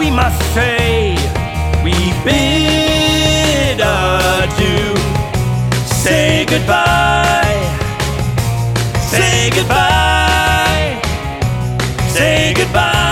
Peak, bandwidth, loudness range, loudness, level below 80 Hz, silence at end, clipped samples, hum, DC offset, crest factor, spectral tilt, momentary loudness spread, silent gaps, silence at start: 0 dBFS; 17 kHz; 1 LU; -13 LUFS; -22 dBFS; 0 s; under 0.1%; none; under 0.1%; 12 dB; -4.5 dB/octave; 6 LU; none; 0 s